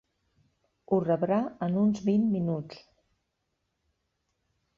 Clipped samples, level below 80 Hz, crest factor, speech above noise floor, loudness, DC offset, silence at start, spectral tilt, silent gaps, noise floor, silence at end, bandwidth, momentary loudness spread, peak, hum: under 0.1%; -66 dBFS; 18 dB; 53 dB; -28 LUFS; under 0.1%; 0.9 s; -9 dB/octave; none; -80 dBFS; 2 s; 7.2 kHz; 6 LU; -12 dBFS; none